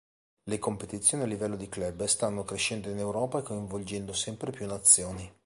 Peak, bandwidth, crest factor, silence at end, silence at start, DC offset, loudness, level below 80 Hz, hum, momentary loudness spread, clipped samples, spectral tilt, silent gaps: -6 dBFS; 12 kHz; 24 dB; 0.15 s; 0.45 s; under 0.1%; -29 LUFS; -56 dBFS; none; 15 LU; under 0.1%; -3 dB/octave; none